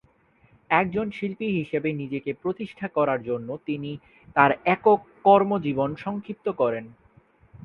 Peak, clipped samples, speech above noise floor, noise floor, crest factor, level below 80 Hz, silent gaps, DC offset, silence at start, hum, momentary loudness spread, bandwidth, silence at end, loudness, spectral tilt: -2 dBFS; under 0.1%; 36 dB; -60 dBFS; 24 dB; -60 dBFS; none; under 0.1%; 0.7 s; none; 12 LU; 5.8 kHz; 0.05 s; -24 LUFS; -9 dB/octave